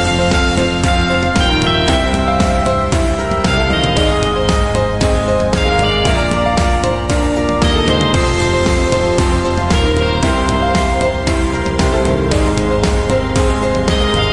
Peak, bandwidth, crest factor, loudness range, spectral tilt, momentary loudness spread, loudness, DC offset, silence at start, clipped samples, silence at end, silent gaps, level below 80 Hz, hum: 0 dBFS; 11.5 kHz; 12 dB; 1 LU; -5 dB/octave; 3 LU; -14 LUFS; 2%; 0 s; under 0.1%; 0 s; none; -20 dBFS; none